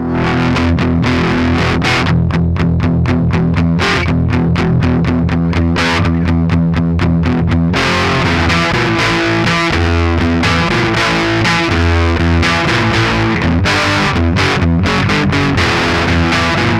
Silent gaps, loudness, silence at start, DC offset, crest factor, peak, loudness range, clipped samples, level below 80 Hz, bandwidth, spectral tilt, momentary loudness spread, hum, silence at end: none; -12 LUFS; 0 s; under 0.1%; 10 dB; -2 dBFS; 1 LU; under 0.1%; -24 dBFS; 11.5 kHz; -6 dB/octave; 2 LU; none; 0 s